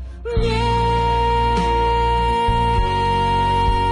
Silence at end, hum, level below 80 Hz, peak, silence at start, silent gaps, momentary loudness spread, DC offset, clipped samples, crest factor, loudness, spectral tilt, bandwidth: 0 s; none; -24 dBFS; -8 dBFS; 0 s; none; 1 LU; under 0.1%; under 0.1%; 10 dB; -18 LUFS; -6 dB/octave; 11 kHz